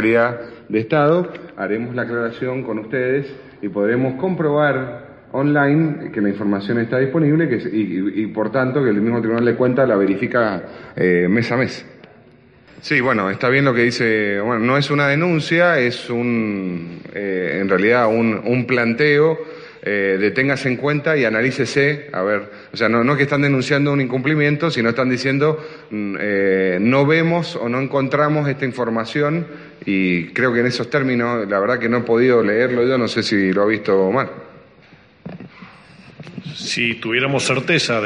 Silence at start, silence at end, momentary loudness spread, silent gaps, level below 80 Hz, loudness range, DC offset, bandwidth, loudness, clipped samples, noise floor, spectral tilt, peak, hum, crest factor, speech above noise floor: 0 s; 0 s; 11 LU; none; -58 dBFS; 4 LU; under 0.1%; 10.5 kHz; -18 LUFS; under 0.1%; -48 dBFS; -6.5 dB/octave; -4 dBFS; none; 14 dB; 30 dB